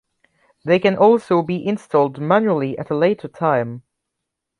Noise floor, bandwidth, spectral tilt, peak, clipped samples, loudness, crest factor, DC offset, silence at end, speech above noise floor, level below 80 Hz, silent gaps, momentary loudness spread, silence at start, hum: -80 dBFS; 11 kHz; -8 dB/octave; -2 dBFS; under 0.1%; -18 LUFS; 16 dB; under 0.1%; 0.8 s; 63 dB; -62 dBFS; none; 9 LU; 0.65 s; none